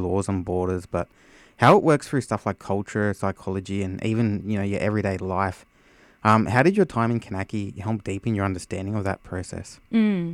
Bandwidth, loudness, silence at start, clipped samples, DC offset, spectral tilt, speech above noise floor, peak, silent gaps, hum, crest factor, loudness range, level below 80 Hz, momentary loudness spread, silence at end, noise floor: 13 kHz; -24 LUFS; 0 s; under 0.1%; under 0.1%; -7 dB/octave; 32 dB; -2 dBFS; none; none; 20 dB; 4 LU; -52 dBFS; 12 LU; 0 s; -55 dBFS